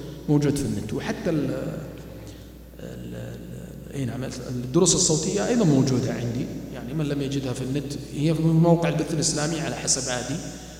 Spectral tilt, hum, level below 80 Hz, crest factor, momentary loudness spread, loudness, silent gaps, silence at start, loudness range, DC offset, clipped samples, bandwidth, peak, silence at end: -5 dB/octave; none; -46 dBFS; 20 dB; 19 LU; -24 LUFS; none; 0 s; 9 LU; under 0.1%; under 0.1%; 16 kHz; -6 dBFS; 0 s